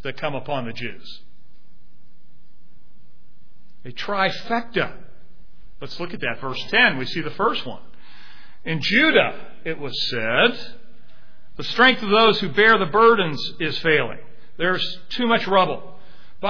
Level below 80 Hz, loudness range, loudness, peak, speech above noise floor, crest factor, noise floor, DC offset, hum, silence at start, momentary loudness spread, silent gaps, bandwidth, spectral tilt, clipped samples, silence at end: -54 dBFS; 12 LU; -20 LUFS; -2 dBFS; 36 dB; 20 dB; -57 dBFS; 4%; none; 0.05 s; 18 LU; none; 5.4 kHz; -5.5 dB/octave; under 0.1%; 0 s